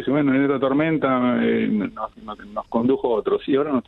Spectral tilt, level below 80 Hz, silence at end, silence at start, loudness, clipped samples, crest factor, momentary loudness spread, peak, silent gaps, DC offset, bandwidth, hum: -9.5 dB/octave; -54 dBFS; 0.05 s; 0 s; -21 LUFS; under 0.1%; 14 dB; 13 LU; -6 dBFS; none; under 0.1%; 4.2 kHz; none